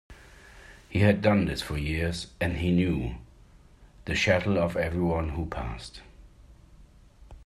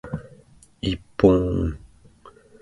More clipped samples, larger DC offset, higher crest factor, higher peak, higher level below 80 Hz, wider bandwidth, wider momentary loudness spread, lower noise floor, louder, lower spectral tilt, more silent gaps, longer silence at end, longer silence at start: neither; neither; about the same, 20 dB vs 24 dB; second, -8 dBFS vs -2 dBFS; second, -44 dBFS vs -38 dBFS; first, 13.5 kHz vs 11.5 kHz; second, 15 LU vs 18 LU; about the same, -54 dBFS vs -52 dBFS; second, -27 LUFS vs -22 LUFS; second, -6.5 dB/octave vs -8 dB/octave; neither; second, 0 s vs 0.75 s; about the same, 0.1 s vs 0.05 s